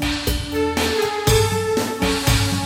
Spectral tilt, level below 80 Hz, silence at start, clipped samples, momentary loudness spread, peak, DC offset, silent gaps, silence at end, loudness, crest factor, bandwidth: -4 dB/octave; -30 dBFS; 0 s; under 0.1%; 5 LU; -4 dBFS; under 0.1%; none; 0 s; -19 LUFS; 16 dB; 17 kHz